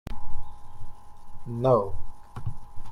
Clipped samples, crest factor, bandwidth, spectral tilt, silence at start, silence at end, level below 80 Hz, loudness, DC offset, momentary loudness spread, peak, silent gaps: under 0.1%; 14 dB; 4.5 kHz; -9 dB/octave; 0.1 s; 0 s; -38 dBFS; -28 LUFS; under 0.1%; 26 LU; -10 dBFS; none